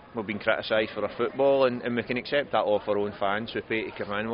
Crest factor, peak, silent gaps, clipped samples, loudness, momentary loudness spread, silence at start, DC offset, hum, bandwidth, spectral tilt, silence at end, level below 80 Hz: 18 dB; -8 dBFS; none; under 0.1%; -27 LUFS; 7 LU; 0 s; under 0.1%; none; 5.4 kHz; -3 dB/octave; 0 s; -60 dBFS